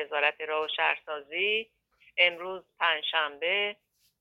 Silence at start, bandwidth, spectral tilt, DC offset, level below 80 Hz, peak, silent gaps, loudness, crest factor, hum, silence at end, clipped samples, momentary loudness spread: 0 s; 12 kHz; -3 dB/octave; under 0.1%; -80 dBFS; -10 dBFS; none; -28 LUFS; 22 dB; none; 0.45 s; under 0.1%; 11 LU